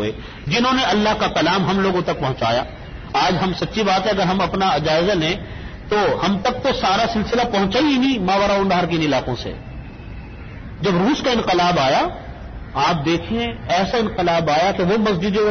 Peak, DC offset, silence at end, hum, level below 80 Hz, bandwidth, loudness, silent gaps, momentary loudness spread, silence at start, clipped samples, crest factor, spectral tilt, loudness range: -8 dBFS; under 0.1%; 0 s; none; -38 dBFS; 6.6 kHz; -18 LUFS; none; 16 LU; 0 s; under 0.1%; 12 dB; -5.5 dB/octave; 2 LU